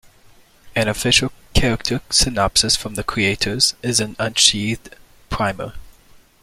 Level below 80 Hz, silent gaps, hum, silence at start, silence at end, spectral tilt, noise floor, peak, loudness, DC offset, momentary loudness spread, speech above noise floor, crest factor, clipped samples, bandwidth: -34 dBFS; none; none; 0.65 s; 0.5 s; -2.5 dB/octave; -50 dBFS; 0 dBFS; -17 LUFS; under 0.1%; 11 LU; 30 dB; 20 dB; under 0.1%; 16.5 kHz